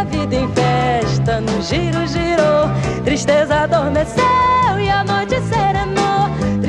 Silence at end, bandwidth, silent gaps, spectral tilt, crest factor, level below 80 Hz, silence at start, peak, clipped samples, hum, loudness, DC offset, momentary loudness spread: 0 s; 11 kHz; none; -6 dB/octave; 12 dB; -32 dBFS; 0 s; -2 dBFS; under 0.1%; none; -16 LUFS; under 0.1%; 5 LU